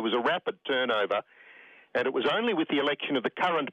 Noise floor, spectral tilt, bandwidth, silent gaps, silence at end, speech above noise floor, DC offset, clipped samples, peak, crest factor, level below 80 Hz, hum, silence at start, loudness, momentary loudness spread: -54 dBFS; -5.5 dB/octave; 8.6 kHz; none; 0 s; 26 dB; under 0.1%; under 0.1%; -16 dBFS; 14 dB; -74 dBFS; none; 0 s; -28 LUFS; 4 LU